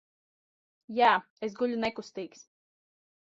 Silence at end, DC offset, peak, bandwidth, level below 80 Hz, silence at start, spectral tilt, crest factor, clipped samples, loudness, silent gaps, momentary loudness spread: 1 s; under 0.1%; -10 dBFS; 7.8 kHz; -72 dBFS; 0.9 s; -4.5 dB/octave; 22 dB; under 0.1%; -28 LUFS; 1.30-1.37 s; 17 LU